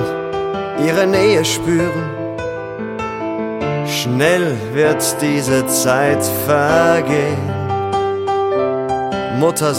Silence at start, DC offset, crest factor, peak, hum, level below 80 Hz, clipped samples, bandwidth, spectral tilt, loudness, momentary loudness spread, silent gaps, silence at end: 0 s; under 0.1%; 14 dB; -2 dBFS; none; -48 dBFS; under 0.1%; 16.5 kHz; -4.5 dB/octave; -16 LUFS; 10 LU; none; 0 s